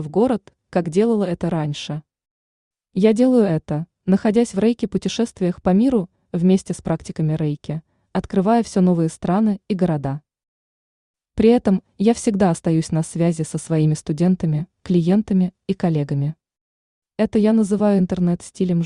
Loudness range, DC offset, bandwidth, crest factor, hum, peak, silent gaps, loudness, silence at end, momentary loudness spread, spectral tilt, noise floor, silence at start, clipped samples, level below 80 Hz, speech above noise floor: 2 LU; under 0.1%; 11 kHz; 16 dB; none; -2 dBFS; 2.31-2.71 s, 10.48-11.14 s, 16.61-17.02 s; -20 LUFS; 0 s; 9 LU; -7.5 dB/octave; under -90 dBFS; 0 s; under 0.1%; -50 dBFS; over 72 dB